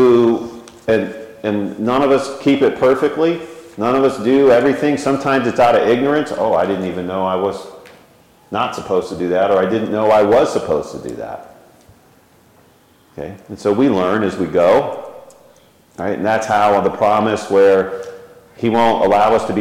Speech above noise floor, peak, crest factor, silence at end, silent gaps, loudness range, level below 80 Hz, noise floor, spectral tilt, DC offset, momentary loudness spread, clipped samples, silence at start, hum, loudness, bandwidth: 36 dB; -4 dBFS; 12 dB; 0 s; none; 5 LU; -52 dBFS; -51 dBFS; -6 dB/octave; under 0.1%; 15 LU; under 0.1%; 0 s; none; -15 LUFS; 15.5 kHz